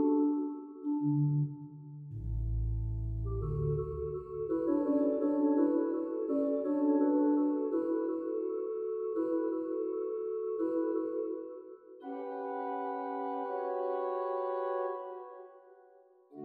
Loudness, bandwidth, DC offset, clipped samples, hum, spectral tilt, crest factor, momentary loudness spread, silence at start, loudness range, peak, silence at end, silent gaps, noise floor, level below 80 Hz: -34 LUFS; 3.1 kHz; under 0.1%; under 0.1%; none; -12 dB/octave; 14 dB; 13 LU; 0 s; 7 LU; -18 dBFS; 0 s; none; -62 dBFS; -48 dBFS